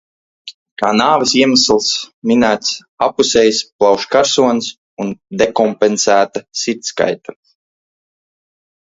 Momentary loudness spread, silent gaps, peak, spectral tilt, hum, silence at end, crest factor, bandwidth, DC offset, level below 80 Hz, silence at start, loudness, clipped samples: 13 LU; 0.54-0.76 s, 2.13-2.22 s, 2.89-2.98 s, 3.72-3.79 s, 4.78-4.97 s; 0 dBFS; -3 dB/octave; none; 1.5 s; 16 dB; 8 kHz; under 0.1%; -52 dBFS; 0.45 s; -14 LUFS; under 0.1%